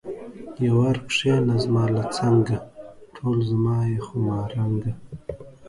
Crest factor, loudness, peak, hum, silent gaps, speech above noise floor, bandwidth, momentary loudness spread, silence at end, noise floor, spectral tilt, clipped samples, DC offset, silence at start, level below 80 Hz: 16 dB; -23 LUFS; -8 dBFS; none; none; 21 dB; 11.5 kHz; 17 LU; 0 s; -43 dBFS; -7 dB/octave; under 0.1%; under 0.1%; 0.05 s; -50 dBFS